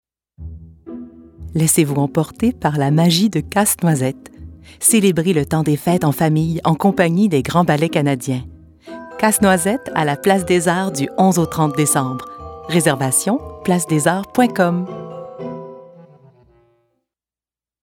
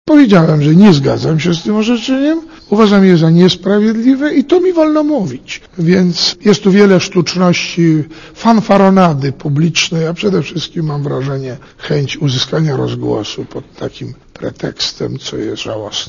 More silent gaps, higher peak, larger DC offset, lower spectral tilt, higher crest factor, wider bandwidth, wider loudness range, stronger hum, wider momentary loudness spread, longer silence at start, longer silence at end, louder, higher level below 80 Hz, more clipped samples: neither; about the same, 0 dBFS vs 0 dBFS; neither; about the same, -5 dB/octave vs -6 dB/octave; about the same, 16 dB vs 12 dB; first, 18.5 kHz vs 7.4 kHz; second, 4 LU vs 8 LU; neither; first, 19 LU vs 14 LU; first, 0.4 s vs 0.05 s; first, 2.05 s vs 0 s; second, -16 LUFS vs -12 LUFS; about the same, -46 dBFS vs -44 dBFS; second, under 0.1% vs 0.5%